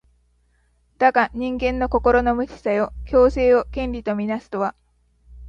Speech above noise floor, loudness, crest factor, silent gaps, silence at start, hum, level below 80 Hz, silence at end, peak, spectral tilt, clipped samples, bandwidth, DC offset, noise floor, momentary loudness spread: 43 dB; -20 LUFS; 20 dB; none; 1 s; 60 Hz at -35 dBFS; -36 dBFS; 0 s; -2 dBFS; -7 dB/octave; under 0.1%; 7.2 kHz; under 0.1%; -62 dBFS; 9 LU